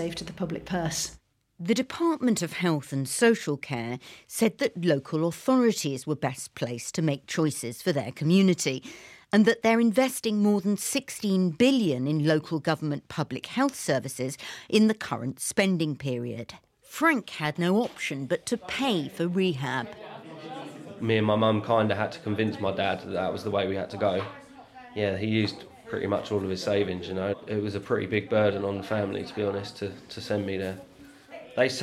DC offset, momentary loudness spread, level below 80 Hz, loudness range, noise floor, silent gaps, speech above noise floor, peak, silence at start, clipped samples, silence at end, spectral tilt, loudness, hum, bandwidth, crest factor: under 0.1%; 13 LU; -64 dBFS; 5 LU; -48 dBFS; none; 21 dB; -8 dBFS; 0 s; under 0.1%; 0 s; -5 dB/octave; -27 LUFS; none; 15.5 kHz; 20 dB